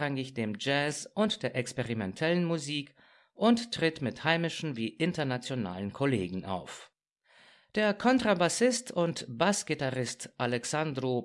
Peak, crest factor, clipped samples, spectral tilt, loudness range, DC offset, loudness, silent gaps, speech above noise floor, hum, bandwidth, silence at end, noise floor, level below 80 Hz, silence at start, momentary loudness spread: -10 dBFS; 22 dB; under 0.1%; -4.5 dB/octave; 4 LU; under 0.1%; -31 LUFS; none; 35 dB; none; 12 kHz; 0 s; -65 dBFS; -68 dBFS; 0 s; 9 LU